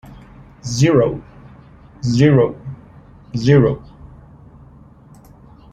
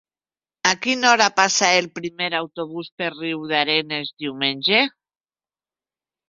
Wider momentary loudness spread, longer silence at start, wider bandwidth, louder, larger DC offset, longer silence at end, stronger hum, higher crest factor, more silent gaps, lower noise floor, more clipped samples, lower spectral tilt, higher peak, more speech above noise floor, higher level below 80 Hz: first, 20 LU vs 13 LU; second, 0.1 s vs 0.65 s; first, 9 kHz vs 7.8 kHz; first, -16 LUFS vs -19 LUFS; neither; first, 1.95 s vs 1.4 s; neither; about the same, 18 dB vs 22 dB; second, none vs 2.92-2.98 s; second, -44 dBFS vs under -90 dBFS; neither; first, -7 dB/octave vs -1.5 dB/octave; about the same, -2 dBFS vs 0 dBFS; second, 30 dB vs over 69 dB; first, -44 dBFS vs -68 dBFS